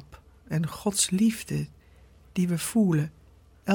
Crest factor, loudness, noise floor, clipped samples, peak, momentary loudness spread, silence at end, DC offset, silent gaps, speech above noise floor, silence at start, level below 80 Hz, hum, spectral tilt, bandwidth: 20 dB; -27 LUFS; -55 dBFS; under 0.1%; -8 dBFS; 12 LU; 0 s; under 0.1%; none; 29 dB; 0.1 s; -56 dBFS; none; -5 dB/octave; 18 kHz